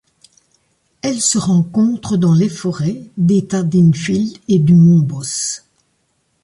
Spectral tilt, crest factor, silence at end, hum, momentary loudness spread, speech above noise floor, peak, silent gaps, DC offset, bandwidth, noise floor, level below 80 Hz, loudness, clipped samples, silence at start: -6 dB/octave; 12 dB; 0.85 s; none; 11 LU; 50 dB; -2 dBFS; none; under 0.1%; 11.5 kHz; -64 dBFS; -52 dBFS; -15 LUFS; under 0.1%; 1.05 s